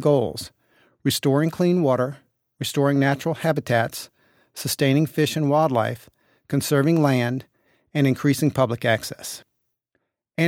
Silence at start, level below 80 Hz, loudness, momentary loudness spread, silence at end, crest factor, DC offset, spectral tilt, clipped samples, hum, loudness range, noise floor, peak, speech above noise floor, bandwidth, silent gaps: 0 s; -62 dBFS; -22 LUFS; 14 LU; 0 s; 18 dB; under 0.1%; -5.5 dB/octave; under 0.1%; none; 2 LU; -75 dBFS; -4 dBFS; 54 dB; 17 kHz; none